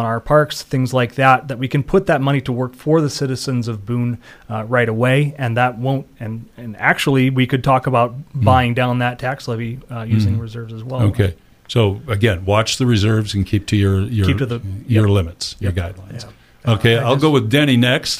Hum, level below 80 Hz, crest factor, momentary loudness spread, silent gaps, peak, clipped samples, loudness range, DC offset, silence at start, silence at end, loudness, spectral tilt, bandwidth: none; -42 dBFS; 16 dB; 12 LU; none; 0 dBFS; under 0.1%; 3 LU; under 0.1%; 0 s; 0 s; -17 LUFS; -6 dB/octave; 15.5 kHz